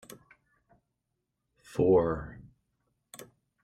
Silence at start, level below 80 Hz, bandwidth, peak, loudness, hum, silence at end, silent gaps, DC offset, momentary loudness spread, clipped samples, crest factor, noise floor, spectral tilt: 1.75 s; -56 dBFS; 15.5 kHz; -14 dBFS; -28 LUFS; none; 0.4 s; none; under 0.1%; 26 LU; under 0.1%; 20 dB; -83 dBFS; -7.5 dB/octave